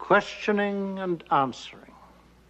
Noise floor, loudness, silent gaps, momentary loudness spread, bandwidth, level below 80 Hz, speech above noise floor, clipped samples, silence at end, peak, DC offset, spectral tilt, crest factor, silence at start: -54 dBFS; -26 LUFS; none; 12 LU; 8.4 kHz; -60 dBFS; 28 dB; under 0.1%; 0.45 s; -8 dBFS; under 0.1%; -6 dB/octave; 20 dB; 0 s